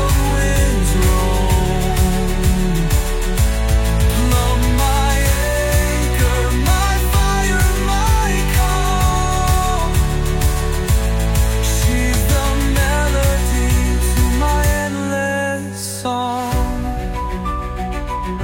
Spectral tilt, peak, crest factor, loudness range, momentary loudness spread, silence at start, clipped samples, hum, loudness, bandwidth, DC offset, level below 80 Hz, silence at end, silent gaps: -5 dB/octave; -2 dBFS; 12 dB; 2 LU; 6 LU; 0 s; under 0.1%; none; -17 LUFS; 17 kHz; under 0.1%; -18 dBFS; 0 s; none